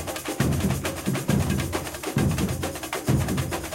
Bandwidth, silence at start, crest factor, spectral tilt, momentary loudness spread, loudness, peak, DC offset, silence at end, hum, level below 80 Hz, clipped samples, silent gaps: 17 kHz; 0 s; 16 dB; -5.5 dB/octave; 5 LU; -26 LUFS; -10 dBFS; under 0.1%; 0 s; none; -38 dBFS; under 0.1%; none